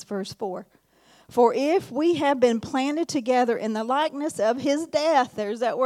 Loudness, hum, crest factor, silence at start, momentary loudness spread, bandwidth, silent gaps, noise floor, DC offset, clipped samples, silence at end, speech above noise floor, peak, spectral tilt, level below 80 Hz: -24 LUFS; none; 16 dB; 0 s; 10 LU; 14.5 kHz; none; -56 dBFS; under 0.1%; under 0.1%; 0 s; 33 dB; -6 dBFS; -4.5 dB/octave; -68 dBFS